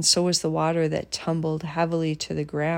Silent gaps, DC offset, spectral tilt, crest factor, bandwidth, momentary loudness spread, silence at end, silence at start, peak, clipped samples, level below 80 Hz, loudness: none; under 0.1%; -4 dB/octave; 18 dB; 16 kHz; 7 LU; 0 s; 0 s; -6 dBFS; under 0.1%; -56 dBFS; -25 LUFS